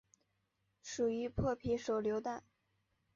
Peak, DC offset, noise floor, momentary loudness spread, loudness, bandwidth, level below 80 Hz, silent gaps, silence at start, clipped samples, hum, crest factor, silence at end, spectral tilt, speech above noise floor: -24 dBFS; under 0.1%; -82 dBFS; 11 LU; -38 LUFS; 7.4 kHz; -58 dBFS; none; 0.85 s; under 0.1%; none; 16 dB; 0.75 s; -6 dB/octave; 45 dB